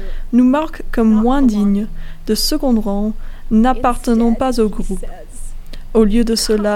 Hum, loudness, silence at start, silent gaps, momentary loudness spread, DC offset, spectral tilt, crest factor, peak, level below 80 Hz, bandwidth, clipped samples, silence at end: none; -15 LUFS; 0 s; none; 16 LU; under 0.1%; -5.5 dB/octave; 14 dB; 0 dBFS; -24 dBFS; 16 kHz; under 0.1%; 0 s